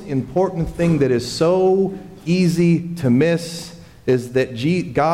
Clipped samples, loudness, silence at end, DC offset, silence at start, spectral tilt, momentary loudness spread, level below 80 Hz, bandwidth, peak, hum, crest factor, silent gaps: under 0.1%; -18 LUFS; 0 s; under 0.1%; 0 s; -7 dB/octave; 9 LU; -44 dBFS; 14 kHz; -6 dBFS; none; 12 dB; none